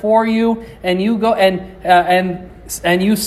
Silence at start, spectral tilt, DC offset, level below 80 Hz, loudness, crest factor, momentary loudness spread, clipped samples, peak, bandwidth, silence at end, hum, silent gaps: 0 s; -5 dB/octave; under 0.1%; -44 dBFS; -15 LUFS; 14 dB; 11 LU; under 0.1%; 0 dBFS; 14.5 kHz; 0 s; none; none